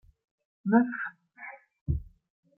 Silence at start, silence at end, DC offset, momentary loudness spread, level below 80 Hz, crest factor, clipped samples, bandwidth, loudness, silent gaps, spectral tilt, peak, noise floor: 0.65 s; 0.5 s; under 0.1%; 20 LU; -46 dBFS; 22 dB; under 0.1%; 2.9 kHz; -29 LUFS; 1.81-1.86 s; -12.5 dB/octave; -10 dBFS; -48 dBFS